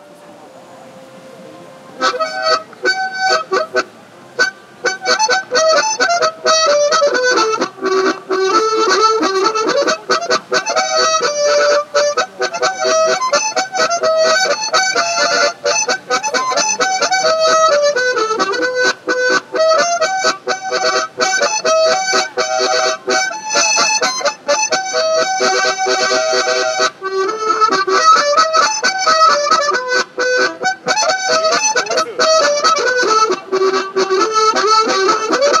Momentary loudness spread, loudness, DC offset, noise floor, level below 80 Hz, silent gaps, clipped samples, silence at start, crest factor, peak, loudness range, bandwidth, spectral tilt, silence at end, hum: 6 LU; -14 LUFS; under 0.1%; -39 dBFS; -74 dBFS; none; under 0.1%; 0.1 s; 14 dB; 0 dBFS; 3 LU; 13 kHz; -0.5 dB/octave; 0 s; none